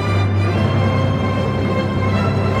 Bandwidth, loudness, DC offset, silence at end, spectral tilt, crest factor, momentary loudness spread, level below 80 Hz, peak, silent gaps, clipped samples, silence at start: 8.6 kHz; -18 LUFS; under 0.1%; 0 s; -7.5 dB/octave; 12 dB; 2 LU; -36 dBFS; -4 dBFS; none; under 0.1%; 0 s